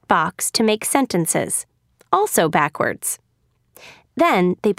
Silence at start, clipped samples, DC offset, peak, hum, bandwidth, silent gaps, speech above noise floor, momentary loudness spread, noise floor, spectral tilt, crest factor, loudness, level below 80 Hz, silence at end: 0.1 s; under 0.1%; under 0.1%; -2 dBFS; none; 16 kHz; none; 46 dB; 8 LU; -65 dBFS; -3.5 dB/octave; 20 dB; -19 LUFS; -60 dBFS; 0.05 s